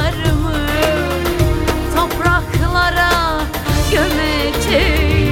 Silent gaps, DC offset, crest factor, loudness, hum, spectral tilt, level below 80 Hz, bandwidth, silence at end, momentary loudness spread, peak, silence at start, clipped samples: none; under 0.1%; 14 dB; -15 LUFS; none; -5 dB/octave; -22 dBFS; 17 kHz; 0 s; 4 LU; -2 dBFS; 0 s; under 0.1%